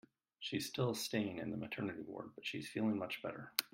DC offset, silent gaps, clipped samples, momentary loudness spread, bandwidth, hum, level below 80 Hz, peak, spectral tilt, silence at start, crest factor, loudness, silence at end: under 0.1%; none; under 0.1%; 7 LU; 16 kHz; none; -78 dBFS; -10 dBFS; -4.5 dB/octave; 0.4 s; 30 dB; -41 LUFS; 0.05 s